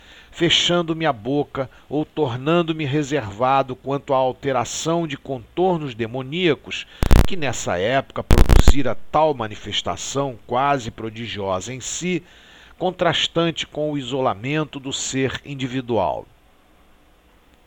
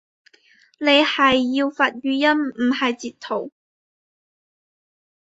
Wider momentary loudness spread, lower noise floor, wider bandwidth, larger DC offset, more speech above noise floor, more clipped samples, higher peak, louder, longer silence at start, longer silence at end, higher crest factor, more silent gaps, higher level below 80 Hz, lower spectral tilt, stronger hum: second, 9 LU vs 12 LU; about the same, -54 dBFS vs -56 dBFS; first, 19 kHz vs 8 kHz; neither; about the same, 34 dB vs 37 dB; first, 0.1% vs under 0.1%; about the same, 0 dBFS vs -2 dBFS; second, -22 LUFS vs -19 LUFS; second, 0.35 s vs 0.8 s; second, 1.45 s vs 1.75 s; about the same, 20 dB vs 20 dB; neither; first, -26 dBFS vs -62 dBFS; about the same, -4.5 dB/octave vs -3.5 dB/octave; neither